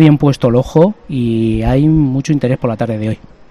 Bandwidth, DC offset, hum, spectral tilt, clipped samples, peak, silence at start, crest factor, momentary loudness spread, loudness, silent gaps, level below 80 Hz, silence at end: 10.5 kHz; 0.6%; none; -8.5 dB/octave; 0.3%; 0 dBFS; 0 s; 12 dB; 8 LU; -13 LUFS; none; -32 dBFS; 0.35 s